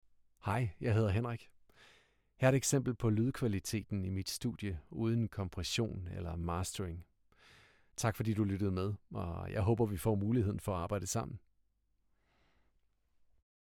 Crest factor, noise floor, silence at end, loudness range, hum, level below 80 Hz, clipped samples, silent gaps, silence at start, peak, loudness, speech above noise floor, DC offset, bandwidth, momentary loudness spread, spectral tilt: 20 dB; -77 dBFS; 2.4 s; 5 LU; none; -56 dBFS; under 0.1%; none; 0.45 s; -16 dBFS; -36 LUFS; 42 dB; under 0.1%; 17 kHz; 10 LU; -5.5 dB/octave